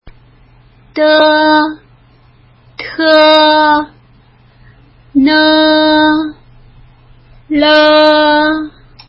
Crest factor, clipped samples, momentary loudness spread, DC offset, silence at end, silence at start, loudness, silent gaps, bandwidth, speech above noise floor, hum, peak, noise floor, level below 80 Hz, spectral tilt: 12 dB; 0.1%; 16 LU; under 0.1%; 0.4 s; 0.05 s; -9 LUFS; none; 8 kHz; 37 dB; none; 0 dBFS; -45 dBFS; -46 dBFS; -5.5 dB/octave